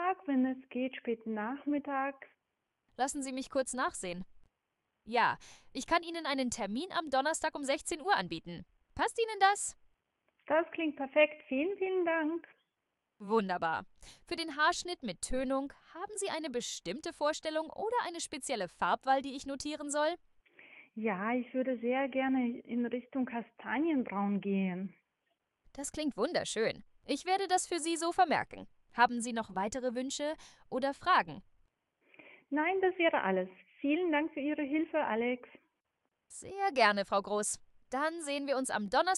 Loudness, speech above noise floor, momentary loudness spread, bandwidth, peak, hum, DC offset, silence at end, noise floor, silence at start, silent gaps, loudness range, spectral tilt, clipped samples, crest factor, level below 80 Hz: -34 LUFS; 52 dB; 12 LU; 13 kHz; -12 dBFS; none; under 0.1%; 0 s; -85 dBFS; 0 s; none; 4 LU; -3.5 dB/octave; under 0.1%; 22 dB; -64 dBFS